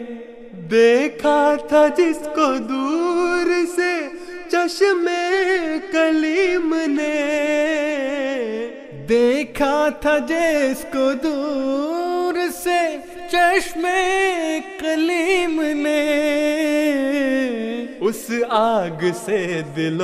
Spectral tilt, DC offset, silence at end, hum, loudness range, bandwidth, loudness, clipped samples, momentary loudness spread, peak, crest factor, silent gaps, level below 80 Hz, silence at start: -4.5 dB/octave; under 0.1%; 0 s; none; 2 LU; 14.5 kHz; -19 LUFS; under 0.1%; 7 LU; -4 dBFS; 16 dB; none; -50 dBFS; 0 s